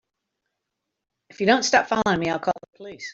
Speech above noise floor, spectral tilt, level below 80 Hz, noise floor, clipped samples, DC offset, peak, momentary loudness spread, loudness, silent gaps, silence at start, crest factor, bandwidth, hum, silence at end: 60 dB; -3.5 dB/octave; -60 dBFS; -82 dBFS; under 0.1%; under 0.1%; -4 dBFS; 16 LU; -22 LUFS; none; 1.4 s; 22 dB; 8 kHz; none; 0 s